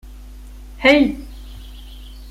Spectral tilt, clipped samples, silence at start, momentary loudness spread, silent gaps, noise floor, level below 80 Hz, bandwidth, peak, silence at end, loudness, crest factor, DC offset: -5 dB/octave; under 0.1%; 0.05 s; 26 LU; none; -36 dBFS; -36 dBFS; 15 kHz; -2 dBFS; 0 s; -15 LUFS; 20 dB; under 0.1%